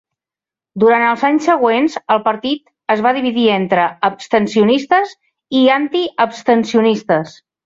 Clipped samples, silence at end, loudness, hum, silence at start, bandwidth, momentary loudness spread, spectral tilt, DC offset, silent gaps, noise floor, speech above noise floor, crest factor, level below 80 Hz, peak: under 0.1%; 0.35 s; -15 LUFS; none; 0.75 s; 7.8 kHz; 7 LU; -5.5 dB/octave; under 0.1%; none; -89 dBFS; 75 dB; 14 dB; -60 dBFS; -2 dBFS